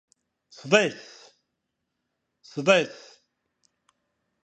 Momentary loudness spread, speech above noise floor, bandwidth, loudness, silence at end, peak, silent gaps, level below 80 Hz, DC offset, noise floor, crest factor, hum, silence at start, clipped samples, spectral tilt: 24 LU; 58 dB; 8.8 kHz; -23 LUFS; 1.5 s; -2 dBFS; none; -74 dBFS; under 0.1%; -81 dBFS; 26 dB; none; 0.65 s; under 0.1%; -4 dB/octave